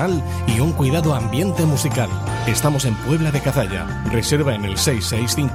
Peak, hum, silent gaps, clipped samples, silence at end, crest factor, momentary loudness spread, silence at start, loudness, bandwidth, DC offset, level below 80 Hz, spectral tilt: -4 dBFS; none; none; under 0.1%; 0 s; 14 dB; 4 LU; 0 s; -19 LUFS; 16 kHz; under 0.1%; -34 dBFS; -5 dB/octave